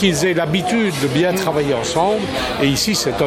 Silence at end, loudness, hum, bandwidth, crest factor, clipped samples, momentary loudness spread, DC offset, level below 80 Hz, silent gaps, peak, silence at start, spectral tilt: 0 s; -17 LUFS; none; 17 kHz; 16 dB; under 0.1%; 2 LU; under 0.1%; -42 dBFS; none; -2 dBFS; 0 s; -4.5 dB/octave